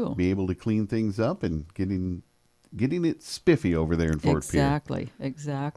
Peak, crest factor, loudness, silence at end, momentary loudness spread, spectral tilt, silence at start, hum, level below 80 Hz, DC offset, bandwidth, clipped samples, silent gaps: -8 dBFS; 18 dB; -27 LUFS; 0.05 s; 10 LU; -7 dB/octave; 0 s; none; -44 dBFS; under 0.1%; 11 kHz; under 0.1%; none